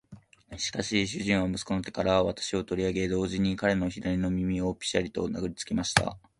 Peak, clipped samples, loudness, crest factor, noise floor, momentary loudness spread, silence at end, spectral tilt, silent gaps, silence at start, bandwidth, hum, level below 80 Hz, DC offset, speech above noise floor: -2 dBFS; under 0.1%; -29 LUFS; 26 dB; -52 dBFS; 6 LU; 0.2 s; -4.5 dB/octave; none; 0.1 s; 11.5 kHz; none; -48 dBFS; under 0.1%; 24 dB